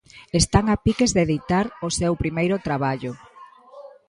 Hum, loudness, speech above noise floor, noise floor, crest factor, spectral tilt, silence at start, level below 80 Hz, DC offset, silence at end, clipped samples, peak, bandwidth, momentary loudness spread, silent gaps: none; -22 LUFS; 25 dB; -46 dBFS; 20 dB; -5 dB/octave; 0.15 s; -38 dBFS; under 0.1%; 0.2 s; under 0.1%; -2 dBFS; 11.5 kHz; 7 LU; none